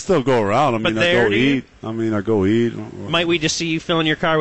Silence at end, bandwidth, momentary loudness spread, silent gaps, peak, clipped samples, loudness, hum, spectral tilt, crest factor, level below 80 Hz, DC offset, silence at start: 0 s; 8.6 kHz; 8 LU; none; -6 dBFS; under 0.1%; -18 LUFS; none; -5 dB/octave; 12 dB; -48 dBFS; 0.6%; 0 s